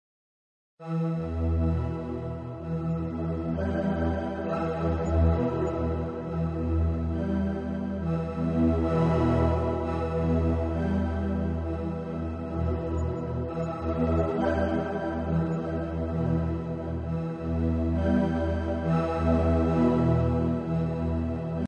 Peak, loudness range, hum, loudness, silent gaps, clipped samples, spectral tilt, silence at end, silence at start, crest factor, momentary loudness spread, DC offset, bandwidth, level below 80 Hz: -12 dBFS; 4 LU; none; -28 LUFS; none; under 0.1%; -9.5 dB/octave; 0 s; 0.8 s; 16 dB; 8 LU; under 0.1%; 7.2 kHz; -40 dBFS